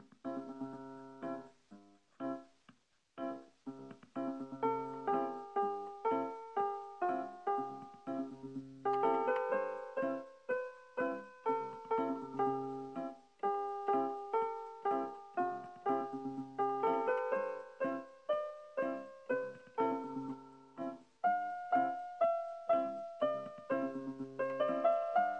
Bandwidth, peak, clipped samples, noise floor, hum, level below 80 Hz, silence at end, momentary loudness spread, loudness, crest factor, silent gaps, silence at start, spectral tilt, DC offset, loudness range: 8.8 kHz; -20 dBFS; under 0.1%; -68 dBFS; none; -84 dBFS; 0 s; 11 LU; -38 LUFS; 18 dB; none; 0 s; -7 dB/octave; under 0.1%; 5 LU